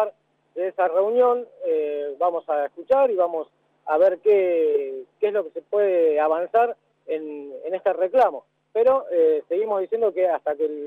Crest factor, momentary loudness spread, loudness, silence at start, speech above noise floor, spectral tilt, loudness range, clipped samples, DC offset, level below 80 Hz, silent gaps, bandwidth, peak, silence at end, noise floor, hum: 14 dB; 11 LU; -22 LUFS; 0 s; 21 dB; -6.5 dB/octave; 2 LU; under 0.1%; under 0.1%; -72 dBFS; none; 4.4 kHz; -8 dBFS; 0 s; -42 dBFS; none